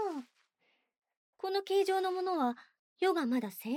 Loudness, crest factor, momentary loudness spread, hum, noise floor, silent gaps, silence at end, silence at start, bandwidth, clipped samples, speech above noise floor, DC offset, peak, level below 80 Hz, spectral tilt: -33 LUFS; 14 dB; 11 LU; none; -77 dBFS; 0.98-1.02 s, 1.17-1.33 s, 2.79-2.96 s; 0 s; 0 s; 16.5 kHz; under 0.1%; 45 dB; under 0.1%; -20 dBFS; under -90 dBFS; -4.5 dB/octave